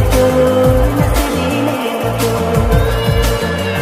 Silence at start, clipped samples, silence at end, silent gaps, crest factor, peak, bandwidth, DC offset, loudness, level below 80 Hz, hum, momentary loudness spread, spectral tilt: 0 s; under 0.1%; 0 s; none; 12 dB; 0 dBFS; 16 kHz; under 0.1%; -14 LUFS; -20 dBFS; none; 5 LU; -6 dB/octave